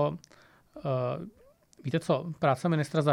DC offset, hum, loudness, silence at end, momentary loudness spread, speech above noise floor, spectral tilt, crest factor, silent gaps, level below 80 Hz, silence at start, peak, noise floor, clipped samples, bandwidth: under 0.1%; none; -30 LUFS; 0 s; 14 LU; 31 dB; -7 dB/octave; 20 dB; none; -68 dBFS; 0 s; -10 dBFS; -59 dBFS; under 0.1%; 12.5 kHz